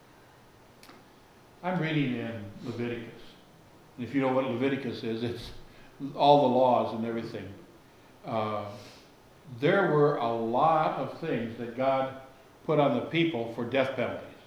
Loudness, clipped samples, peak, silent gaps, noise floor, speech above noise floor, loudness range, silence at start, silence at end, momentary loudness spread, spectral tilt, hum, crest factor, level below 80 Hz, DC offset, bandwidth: -28 LUFS; under 0.1%; -8 dBFS; none; -56 dBFS; 28 dB; 7 LU; 0.85 s; 0.1 s; 18 LU; -7.5 dB/octave; none; 22 dB; -62 dBFS; under 0.1%; over 20 kHz